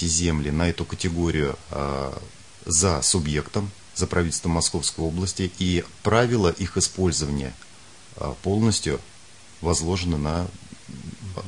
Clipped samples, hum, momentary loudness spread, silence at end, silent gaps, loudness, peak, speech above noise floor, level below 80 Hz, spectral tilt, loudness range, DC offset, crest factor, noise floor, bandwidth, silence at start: under 0.1%; none; 15 LU; 0 s; none; -24 LUFS; -4 dBFS; 25 dB; -42 dBFS; -4 dB/octave; 3 LU; 0.4%; 20 dB; -49 dBFS; 11 kHz; 0 s